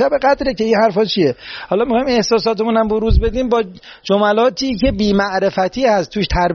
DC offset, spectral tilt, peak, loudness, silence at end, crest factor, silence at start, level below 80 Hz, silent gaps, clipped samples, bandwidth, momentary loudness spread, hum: under 0.1%; -4 dB/octave; -2 dBFS; -16 LUFS; 0 s; 14 dB; 0 s; -28 dBFS; none; under 0.1%; 7 kHz; 5 LU; none